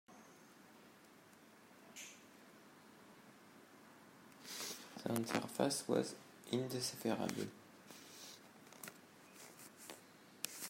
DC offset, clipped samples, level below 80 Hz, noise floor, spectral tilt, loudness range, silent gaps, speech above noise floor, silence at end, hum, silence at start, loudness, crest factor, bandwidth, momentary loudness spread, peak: under 0.1%; under 0.1%; -88 dBFS; -64 dBFS; -4 dB/octave; 18 LU; none; 24 dB; 0 s; none; 0.1 s; -43 LUFS; 32 dB; 16 kHz; 22 LU; -14 dBFS